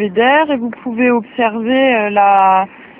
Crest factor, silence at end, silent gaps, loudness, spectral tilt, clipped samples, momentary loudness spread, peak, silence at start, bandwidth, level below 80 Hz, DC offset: 12 dB; 0.15 s; none; -13 LUFS; -8 dB/octave; under 0.1%; 7 LU; 0 dBFS; 0 s; 3.7 kHz; -56 dBFS; under 0.1%